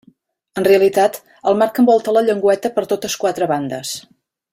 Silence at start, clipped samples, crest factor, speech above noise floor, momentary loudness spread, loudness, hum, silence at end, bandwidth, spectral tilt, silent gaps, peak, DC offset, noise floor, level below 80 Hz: 0.55 s; under 0.1%; 14 dB; 38 dB; 11 LU; -16 LUFS; none; 0.55 s; 16.5 kHz; -4.5 dB/octave; none; -2 dBFS; under 0.1%; -54 dBFS; -60 dBFS